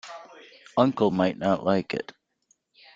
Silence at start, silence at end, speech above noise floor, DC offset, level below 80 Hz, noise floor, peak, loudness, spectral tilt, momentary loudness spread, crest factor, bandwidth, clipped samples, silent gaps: 0.05 s; 0.95 s; 44 dB; under 0.1%; -64 dBFS; -69 dBFS; -6 dBFS; -25 LUFS; -7 dB/octave; 20 LU; 22 dB; 7.8 kHz; under 0.1%; none